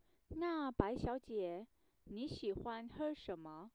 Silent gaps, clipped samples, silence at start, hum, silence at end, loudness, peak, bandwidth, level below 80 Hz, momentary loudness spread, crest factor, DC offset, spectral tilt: none; under 0.1%; 0.3 s; none; 0.05 s; -44 LUFS; -18 dBFS; 10.5 kHz; -58 dBFS; 12 LU; 24 dB; under 0.1%; -7.5 dB/octave